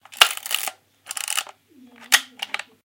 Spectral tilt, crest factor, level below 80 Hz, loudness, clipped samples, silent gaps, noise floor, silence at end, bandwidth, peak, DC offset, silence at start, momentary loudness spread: 3 dB/octave; 26 dB; -70 dBFS; -21 LUFS; under 0.1%; none; -51 dBFS; 0.25 s; 17.5 kHz; 0 dBFS; under 0.1%; 0.1 s; 14 LU